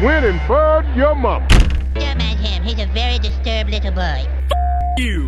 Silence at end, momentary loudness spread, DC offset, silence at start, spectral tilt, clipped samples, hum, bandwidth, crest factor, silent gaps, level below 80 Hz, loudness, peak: 0 s; 6 LU; under 0.1%; 0 s; -6 dB/octave; under 0.1%; none; 11.5 kHz; 14 dB; none; -18 dBFS; -17 LUFS; -2 dBFS